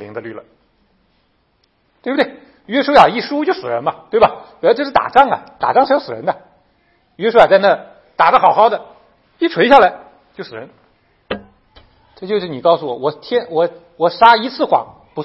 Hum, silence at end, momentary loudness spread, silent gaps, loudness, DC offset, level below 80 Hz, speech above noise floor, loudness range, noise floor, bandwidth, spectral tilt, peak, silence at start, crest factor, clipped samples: none; 0 s; 19 LU; none; -14 LUFS; under 0.1%; -52 dBFS; 47 dB; 7 LU; -60 dBFS; 9.4 kHz; -6 dB/octave; 0 dBFS; 0 s; 16 dB; 0.2%